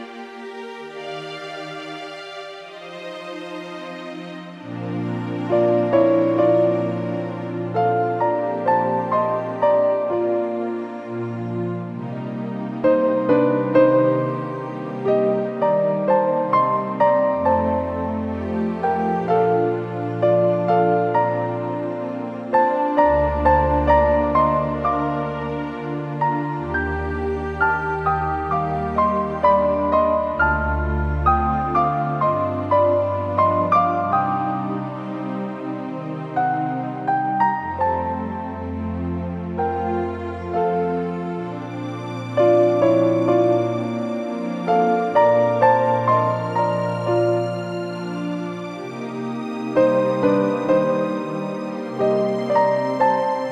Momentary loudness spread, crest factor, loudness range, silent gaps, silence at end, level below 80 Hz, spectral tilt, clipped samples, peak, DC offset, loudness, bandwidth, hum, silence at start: 12 LU; 18 dB; 6 LU; none; 0 s; -38 dBFS; -8.5 dB/octave; under 0.1%; -2 dBFS; under 0.1%; -20 LUFS; 8.8 kHz; none; 0 s